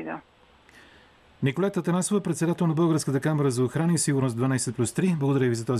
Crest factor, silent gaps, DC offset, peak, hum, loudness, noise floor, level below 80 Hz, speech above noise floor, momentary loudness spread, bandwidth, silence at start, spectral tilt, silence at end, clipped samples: 12 dB; none; under 0.1%; -14 dBFS; none; -25 LUFS; -55 dBFS; -64 dBFS; 31 dB; 4 LU; 14 kHz; 0 s; -6 dB/octave; 0 s; under 0.1%